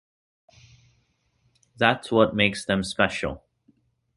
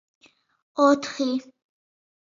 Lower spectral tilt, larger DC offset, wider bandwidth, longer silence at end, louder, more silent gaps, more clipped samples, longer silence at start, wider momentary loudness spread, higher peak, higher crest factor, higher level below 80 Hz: first, -5 dB/octave vs -3.5 dB/octave; neither; first, 11.5 kHz vs 7.6 kHz; about the same, 0.8 s vs 0.85 s; about the same, -23 LUFS vs -23 LUFS; neither; neither; first, 1.8 s vs 0.75 s; about the same, 11 LU vs 12 LU; first, -2 dBFS vs -6 dBFS; about the same, 24 dB vs 20 dB; first, -52 dBFS vs -76 dBFS